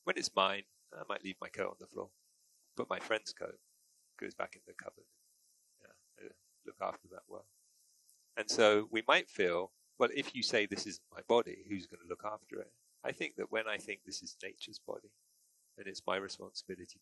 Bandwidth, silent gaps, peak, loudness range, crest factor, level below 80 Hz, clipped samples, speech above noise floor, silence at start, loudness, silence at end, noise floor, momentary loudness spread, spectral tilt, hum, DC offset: 12 kHz; none; -12 dBFS; 17 LU; 28 dB; -78 dBFS; under 0.1%; 35 dB; 0.05 s; -37 LUFS; 0.1 s; -73 dBFS; 22 LU; -2.5 dB/octave; none; under 0.1%